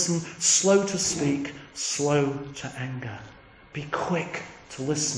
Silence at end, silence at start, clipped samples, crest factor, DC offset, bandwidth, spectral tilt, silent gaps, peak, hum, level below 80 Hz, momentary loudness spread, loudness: 0 s; 0 s; under 0.1%; 18 dB; under 0.1%; 10.5 kHz; -3.5 dB/octave; none; -8 dBFS; none; -58 dBFS; 17 LU; -25 LUFS